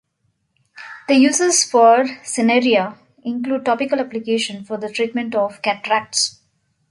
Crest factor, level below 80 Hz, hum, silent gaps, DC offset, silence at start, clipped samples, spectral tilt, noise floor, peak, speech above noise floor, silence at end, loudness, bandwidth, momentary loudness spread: 16 dB; -68 dBFS; none; none; under 0.1%; 0.75 s; under 0.1%; -2.5 dB/octave; -68 dBFS; -2 dBFS; 51 dB; 0.6 s; -17 LUFS; 11.5 kHz; 14 LU